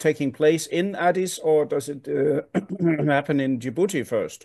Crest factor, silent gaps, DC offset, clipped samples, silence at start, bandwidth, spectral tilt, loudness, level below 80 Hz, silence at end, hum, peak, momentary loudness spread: 16 dB; none; under 0.1%; under 0.1%; 0 s; 12.5 kHz; -5.5 dB/octave; -23 LUFS; -70 dBFS; 0.1 s; none; -6 dBFS; 6 LU